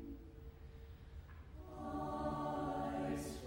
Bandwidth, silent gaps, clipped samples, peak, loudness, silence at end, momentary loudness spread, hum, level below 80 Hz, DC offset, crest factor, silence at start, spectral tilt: 16 kHz; none; under 0.1%; -30 dBFS; -43 LUFS; 0 s; 15 LU; none; -56 dBFS; under 0.1%; 16 dB; 0 s; -6.5 dB/octave